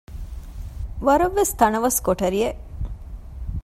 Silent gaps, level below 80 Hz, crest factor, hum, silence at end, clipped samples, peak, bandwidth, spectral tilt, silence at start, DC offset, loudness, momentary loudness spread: none; -34 dBFS; 22 dB; none; 0 s; under 0.1%; -2 dBFS; 16 kHz; -4.5 dB/octave; 0.1 s; under 0.1%; -20 LUFS; 19 LU